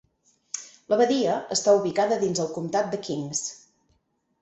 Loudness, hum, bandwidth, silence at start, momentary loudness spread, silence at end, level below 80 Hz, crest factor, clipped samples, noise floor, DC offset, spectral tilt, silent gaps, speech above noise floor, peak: -24 LUFS; none; 8.4 kHz; 0.55 s; 15 LU; 0.85 s; -68 dBFS; 18 dB; under 0.1%; -71 dBFS; under 0.1%; -4 dB/octave; none; 47 dB; -8 dBFS